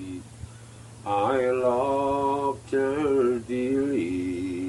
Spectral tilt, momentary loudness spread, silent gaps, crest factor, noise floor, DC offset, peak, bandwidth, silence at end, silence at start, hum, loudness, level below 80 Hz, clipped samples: -6.5 dB/octave; 19 LU; none; 14 dB; -45 dBFS; under 0.1%; -10 dBFS; 12 kHz; 0 s; 0 s; none; -25 LUFS; -54 dBFS; under 0.1%